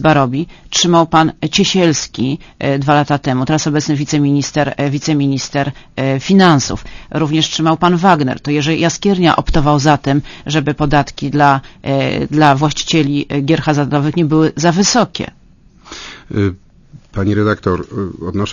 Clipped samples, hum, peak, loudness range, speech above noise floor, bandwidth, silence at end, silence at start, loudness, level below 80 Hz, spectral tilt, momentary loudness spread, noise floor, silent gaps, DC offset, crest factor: under 0.1%; none; 0 dBFS; 3 LU; 30 dB; 7.4 kHz; 0 s; 0 s; -14 LUFS; -34 dBFS; -5 dB/octave; 9 LU; -43 dBFS; none; under 0.1%; 14 dB